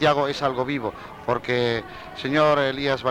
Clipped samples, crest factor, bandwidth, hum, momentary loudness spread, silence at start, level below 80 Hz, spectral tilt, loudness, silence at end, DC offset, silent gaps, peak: under 0.1%; 16 dB; 15.5 kHz; none; 12 LU; 0 s; -52 dBFS; -5.5 dB/octave; -23 LUFS; 0 s; under 0.1%; none; -6 dBFS